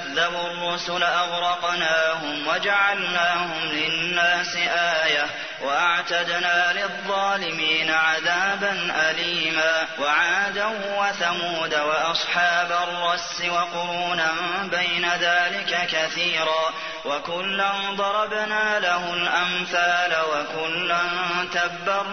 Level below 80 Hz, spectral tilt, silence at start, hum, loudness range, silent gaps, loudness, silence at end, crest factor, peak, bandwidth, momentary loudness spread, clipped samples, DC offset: -64 dBFS; -2 dB/octave; 0 s; none; 2 LU; none; -22 LUFS; 0 s; 16 dB; -6 dBFS; 6.6 kHz; 5 LU; under 0.1%; 0.2%